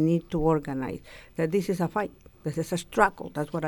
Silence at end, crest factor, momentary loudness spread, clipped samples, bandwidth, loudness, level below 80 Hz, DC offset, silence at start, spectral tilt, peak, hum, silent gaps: 0 s; 22 dB; 12 LU; under 0.1%; 17.5 kHz; -28 LUFS; -48 dBFS; under 0.1%; 0 s; -6.5 dB/octave; -6 dBFS; none; none